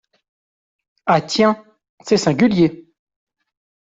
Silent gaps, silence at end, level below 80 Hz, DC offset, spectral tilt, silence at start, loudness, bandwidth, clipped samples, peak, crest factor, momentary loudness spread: 1.89-1.98 s; 1.1 s; -56 dBFS; under 0.1%; -5.5 dB/octave; 1.05 s; -17 LUFS; 7.8 kHz; under 0.1%; -2 dBFS; 18 dB; 12 LU